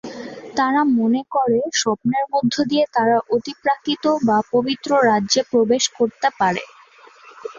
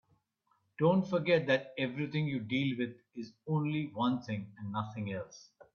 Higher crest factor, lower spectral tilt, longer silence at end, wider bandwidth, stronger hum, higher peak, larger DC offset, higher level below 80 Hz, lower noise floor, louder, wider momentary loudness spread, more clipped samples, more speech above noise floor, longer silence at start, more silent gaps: second, 14 dB vs 20 dB; second, -3.5 dB/octave vs -7.5 dB/octave; about the same, 0 s vs 0.1 s; first, 7.6 kHz vs 6.8 kHz; neither; first, -4 dBFS vs -14 dBFS; neither; first, -62 dBFS vs -74 dBFS; second, -47 dBFS vs -76 dBFS; first, -19 LUFS vs -33 LUFS; second, 5 LU vs 12 LU; neither; second, 29 dB vs 43 dB; second, 0.05 s vs 0.8 s; neither